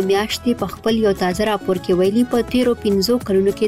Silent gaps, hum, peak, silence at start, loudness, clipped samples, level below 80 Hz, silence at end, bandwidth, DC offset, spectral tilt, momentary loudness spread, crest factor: none; none; -8 dBFS; 0 s; -18 LUFS; under 0.1%; -42 dBFS; 0 s; 16 kHz; under 0.1%; -5.5 dB/octave; 4 LU; 10 dB